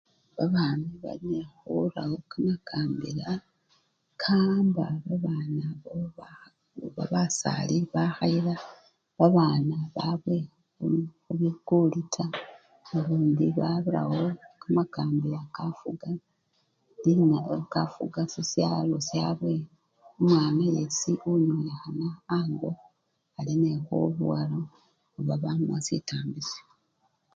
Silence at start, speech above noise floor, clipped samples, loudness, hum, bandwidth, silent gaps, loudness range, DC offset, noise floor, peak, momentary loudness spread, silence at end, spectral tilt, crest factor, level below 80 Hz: 0.35 s; 46 dB; under 0.1%; -28 LUFS; none; 9 kHz; none; 4 LU; under 0.1%; -73 dBFS; -6 dBFS; 13 LU; 0.75 s; -6.5 dB/octave; 22 dB; -66 dBFS